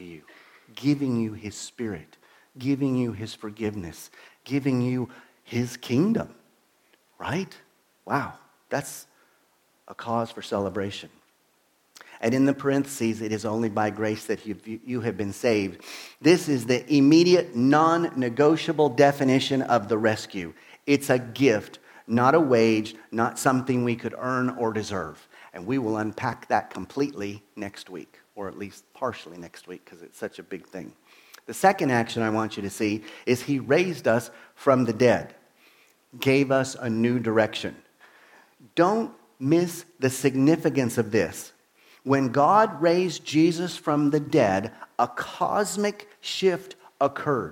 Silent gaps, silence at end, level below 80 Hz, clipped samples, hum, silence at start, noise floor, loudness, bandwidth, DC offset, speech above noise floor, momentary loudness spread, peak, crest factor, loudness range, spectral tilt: none; 0 s; -66 dBFS; under 0.1%; none; 0 s; -66 dBFS; -24 LUFS; 17 kHz; under 0.1%; 42 dB; 18 LU; -4 dBFS; 20 dB; 11 LU; -5.5 dB/octave